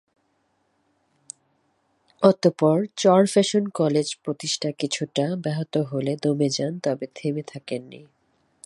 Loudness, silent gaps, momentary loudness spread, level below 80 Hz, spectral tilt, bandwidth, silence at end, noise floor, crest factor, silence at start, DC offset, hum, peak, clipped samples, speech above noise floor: -23 LUFS; none; 14 LU; -72 dBFS; -5.5 dB/octave; 11.5 kHz; 0.65 s; -69 dBFS; 24 dB; 2.2 s; under 0.1%; none; 0 dBFS; under 0.1%; 47 dB